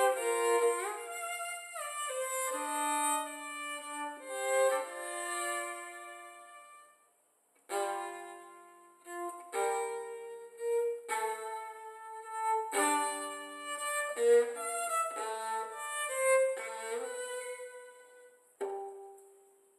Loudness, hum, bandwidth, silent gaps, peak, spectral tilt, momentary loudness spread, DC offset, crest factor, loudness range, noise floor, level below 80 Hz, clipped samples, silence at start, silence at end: -34 LUFS; none; 13 kHz; none; -16 dBFS; 1 dB/octave; 17 LU; under 0.1%; 20 dB; 9 LU; -72 dBFS; under -90 dBFS; under 0.1%; 0 s; 0.45 s